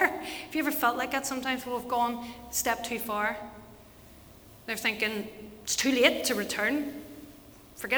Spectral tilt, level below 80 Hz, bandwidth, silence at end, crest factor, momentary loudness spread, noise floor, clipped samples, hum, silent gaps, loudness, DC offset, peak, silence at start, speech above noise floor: -2 dB/octave; -60 dBFS; over 20 kHz; 0 s; 24 dB; 20 LU; -52 dBFS; under 0.1%; none; none; -29 LUFS; under 0.1%; -6 dBFS; 0 s; 23 dB